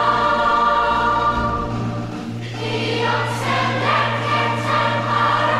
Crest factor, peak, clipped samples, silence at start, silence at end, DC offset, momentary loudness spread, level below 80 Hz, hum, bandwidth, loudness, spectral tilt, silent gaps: 14 dB; -6 dBFS; under 0.1%; 0 s; 0 s; 0.1%; 9 LU; -40 dBFS; none; 13 kHz; -19 LUFS; -5.5 dB/octave; none